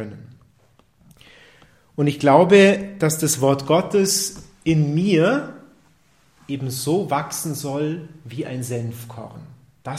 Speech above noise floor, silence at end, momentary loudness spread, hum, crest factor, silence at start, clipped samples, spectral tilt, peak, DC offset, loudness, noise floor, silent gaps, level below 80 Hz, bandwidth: 39 dB; 0 s; 21 LU; none; 20 dB; 0 s; under 0.1%; -5 dB/octave; 0 dBFS; under 0.1%; -19 LUFS; -58 dBFS; none; -56 dBFS; 16 kHz